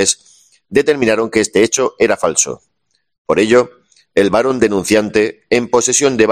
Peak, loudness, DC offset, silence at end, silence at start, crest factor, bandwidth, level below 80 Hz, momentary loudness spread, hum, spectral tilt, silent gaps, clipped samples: 0 dBFS; -14 LUFS; under 0.1%; 0 s; 0 s; 14 dB; 14 kHz; -50 dBFS; 6 LU; none; -3 dB/octave; 3.18-3.25 s; under 0.1%